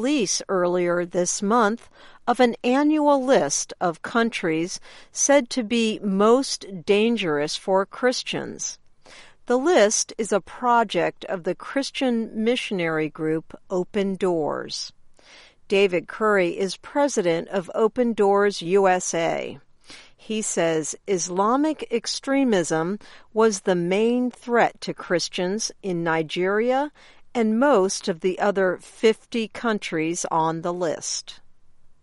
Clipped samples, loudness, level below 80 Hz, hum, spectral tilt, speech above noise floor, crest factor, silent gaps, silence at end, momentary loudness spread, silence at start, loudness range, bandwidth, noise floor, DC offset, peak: under 0.1%; -23 LUFS; -58 dBFS; none; -4 dB/octave; 28 dB; 18 dB; none; 0.15 s; 10 LU; 0 s; 3 LU; 11.5 kHz; -50 dBFS; under 0.1%; -6 dBFS